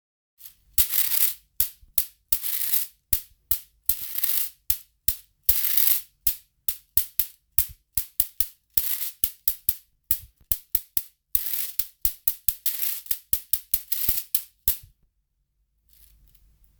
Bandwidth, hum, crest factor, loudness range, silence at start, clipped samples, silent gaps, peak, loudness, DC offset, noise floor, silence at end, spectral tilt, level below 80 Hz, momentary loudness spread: over 20 kHz; none; 28 dB; 3 LU; 0.45 s; under 0.1%; none; 0 dBFS; -23 LUFS; under 0.1%; -73 dBFS; 2 s; 0.5 dB/octave; -48 dBFS; 7 LU